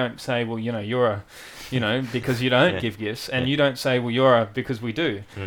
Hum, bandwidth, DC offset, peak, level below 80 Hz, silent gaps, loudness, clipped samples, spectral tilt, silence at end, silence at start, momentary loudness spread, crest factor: none; 19.5 kHz; under 0.1%; -6 dBFS; -54 dBFS; none; -23 LUFS; under 0.1%; -6 dB/octave; 0 s; 0 s; 10 LU; 18 dB